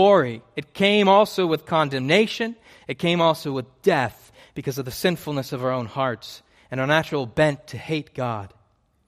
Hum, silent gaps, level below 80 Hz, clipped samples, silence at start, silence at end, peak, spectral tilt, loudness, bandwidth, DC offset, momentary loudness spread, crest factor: none; none; -58 dBFS; under 0.1%; 0 s; 0.6 s; -4 dBFS; -5.5 dB/octave; -22 LUFS; 15.5 kHz; under 0.1%; 16 LU; 18 dB